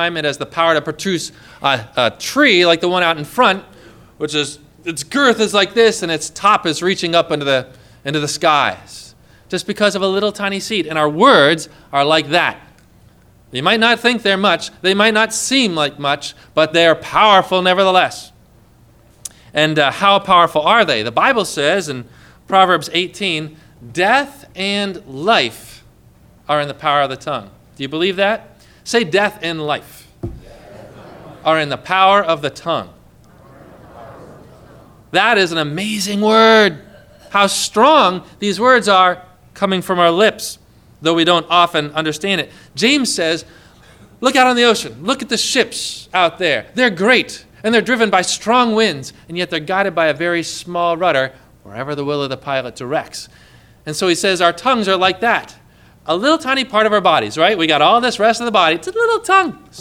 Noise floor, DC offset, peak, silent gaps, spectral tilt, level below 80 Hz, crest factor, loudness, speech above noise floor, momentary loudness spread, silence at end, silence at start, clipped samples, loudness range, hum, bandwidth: -48 dBFS; under 0.1%; 0 dBFS; none; -3.5 dB/octave; -52 dBFS; 16 dB; -15 LUFS; 33 dB; 12 LU; 0 s; 0 s; under 0.1%; 6 LU; none; 17 kHz